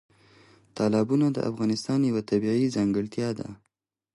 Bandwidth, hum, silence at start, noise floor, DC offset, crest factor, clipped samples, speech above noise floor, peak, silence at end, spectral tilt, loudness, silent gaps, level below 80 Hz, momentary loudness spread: 11.5 kHz; none; 0.75 s; -57 dBFS; under 0.1%; 14 dB; under 0.1%; 32 dB; -12 dBFS; 0.6 s; -7 dB/octave; -26 LUFS; none; -62 dBFS; 8 LU